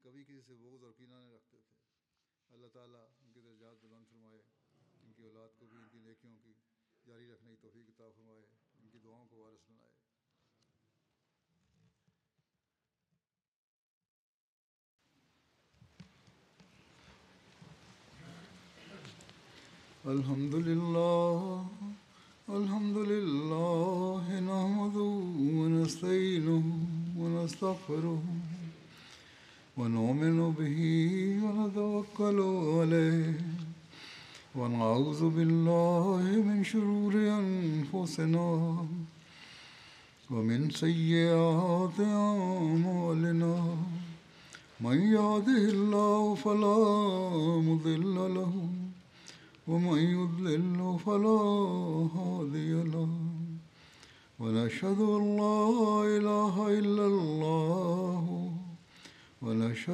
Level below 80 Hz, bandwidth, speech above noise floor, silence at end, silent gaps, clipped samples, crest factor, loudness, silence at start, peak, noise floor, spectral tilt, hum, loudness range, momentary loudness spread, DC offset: -76 dBFS; 11 kHz; 59 dB; 0 s; none; under 0.1%; 18 dB; -30 LUFS; 18.2 s; -14 dBFS; -89 dBFS; -7.5 dB/octave; none; 6 LU; 16 LU; under 0.1%